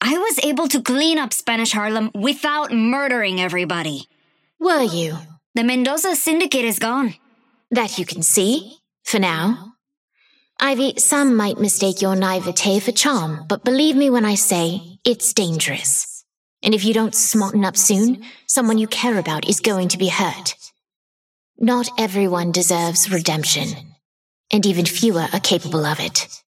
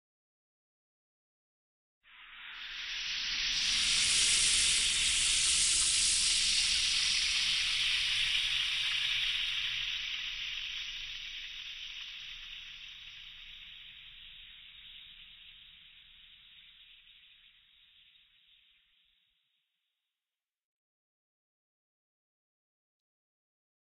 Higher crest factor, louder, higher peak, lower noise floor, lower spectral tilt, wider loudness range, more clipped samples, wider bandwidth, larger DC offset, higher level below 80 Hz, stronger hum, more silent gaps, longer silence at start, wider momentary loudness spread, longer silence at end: about the same, 16 dB vs 20 dB; first, -18 LUFS vs -28 LUFS; first, -2 dBFS vs -14 dBFS; second, -60 dBFS vs under -90 dBFS; first, -3 dB/octave vs 2.5 dB/octave; second, 3 LU vs 22 LU; neither; about the same, 16.5 kHz vs 16.5 kHz; neither; second, -70 dBFS vs -58 dBFS; neither; first, 5.46-5.54 s, 9.97-10.08 s, 16.37-16.57 s, 20.96-21.54 s, 24.05-24.44 s vs none; second, 0 s vs 2.15 s; second, 8 LU vs 23 LU; second, 0.15 s vs 7.15 s